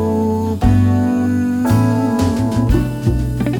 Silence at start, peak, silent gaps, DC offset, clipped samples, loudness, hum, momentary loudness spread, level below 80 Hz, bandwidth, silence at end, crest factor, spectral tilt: 0 s; 0 dBFS; none; under 0.1%; under 0.1%; -16 LUFS; none; 4 LU; -26 dBFS; 19.5 kHz; 0 s; 14 dB; -8 dB/octave